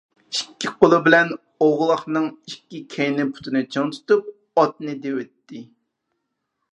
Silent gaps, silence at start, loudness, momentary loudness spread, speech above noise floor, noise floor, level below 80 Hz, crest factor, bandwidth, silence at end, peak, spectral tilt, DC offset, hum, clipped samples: none; 0.3 s; -20 LUFS; 19 LU; 56 dB; -77 dBFS; -64 dBFS; 22 dB; 10.5 kHz; 1.1 s; 0 dBFS; -5 dB/octave; under 0.1%; none; under 0.1%